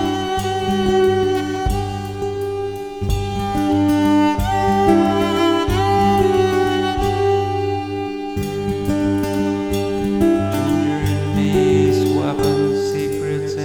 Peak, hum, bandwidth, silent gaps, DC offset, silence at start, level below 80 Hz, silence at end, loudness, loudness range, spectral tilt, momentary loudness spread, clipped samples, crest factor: -2 dBFS; none; 19.5 kHz; none; 0.1%; 0 s; -34 dBFS; 0 s; -18 LUFS; 4 LU; -6.5 dB/octave; 8 LU; under 0.1%; 14 dB